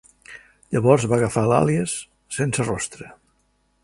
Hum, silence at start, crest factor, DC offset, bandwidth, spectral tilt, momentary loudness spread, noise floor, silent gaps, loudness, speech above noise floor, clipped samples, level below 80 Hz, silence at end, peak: none; 0.3 s; 22 dB; under 0.1%; 11.5 kHz; -5.5 dB/octave; 24 LU; -66 dBFS; none; -21 LUFS; 45 dB; under 0.1%; -50 dBFS; 0.7 s; -2 dBFS